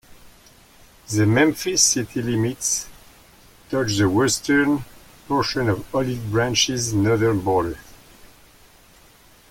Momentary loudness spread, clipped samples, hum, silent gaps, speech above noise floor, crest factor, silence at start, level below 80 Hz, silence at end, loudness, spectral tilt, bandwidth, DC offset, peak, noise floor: 8 LU; under 0.1%; none; none; 31 dB; 20 dB; 0.25 s; -48 dBFS; 1.6 s; -20 LUFS; -4 dB/octave; 17 kHz; under 0.1%; -2 dBFS; -51 dBFS